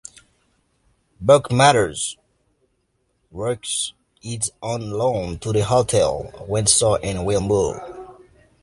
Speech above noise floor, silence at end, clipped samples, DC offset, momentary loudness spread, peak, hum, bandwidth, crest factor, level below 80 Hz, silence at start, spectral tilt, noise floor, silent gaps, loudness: 49 dB; 0.5 s; under 0.1%; under 0.1%; 17 LU; -2 dBFS; none; 11.5 kHz; 20 dB; -44 dBFS; 1.2 s; -4 dB/octave; -69 dBFS; none; -20 LUFS